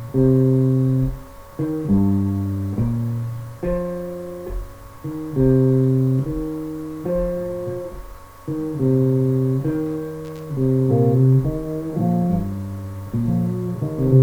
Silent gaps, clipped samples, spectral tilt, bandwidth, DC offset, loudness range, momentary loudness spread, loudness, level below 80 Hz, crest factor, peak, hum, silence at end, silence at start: none; under 0.1%; -10.5 dB/octave; 16 kHz; under 0.1%; 4 LU; 15 LU; -21 LUFS; -38 dBFS; 16 dB; -4 dBFS; none; 0 s; 0 s